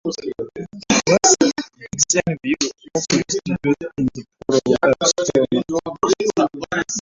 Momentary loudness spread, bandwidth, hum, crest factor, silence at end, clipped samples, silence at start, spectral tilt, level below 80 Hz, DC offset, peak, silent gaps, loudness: 14 LU; 8 kHz; none; 18 dB; 0 s; under 0.1%; 0.05 s; -3.5 dB/octave; -50 dBFS; under 0.1%; 0 dBFS; none; -19 LUFS